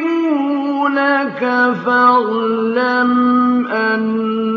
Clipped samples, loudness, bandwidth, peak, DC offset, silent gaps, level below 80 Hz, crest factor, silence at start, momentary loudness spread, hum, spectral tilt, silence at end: under 0.1%; -15 LUFS; 6 kHz; -2 dBFS; under 0.1%; none; -66 dBFS; 14 dB; 0 s; 5 LU; none; -7 dB/octave; 0 s